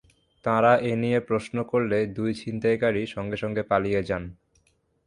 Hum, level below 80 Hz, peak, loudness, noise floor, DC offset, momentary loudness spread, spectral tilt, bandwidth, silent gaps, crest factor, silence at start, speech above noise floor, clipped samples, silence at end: none; -54 dBFS; -8 dBFS; -25 LUFS; -67 dBFS; under 0.1%; 10 LU; -7 dB/octave; 11 kHz; none; 18 dB; 0.45 s; 42 dB; under 0.1%; 0.75 s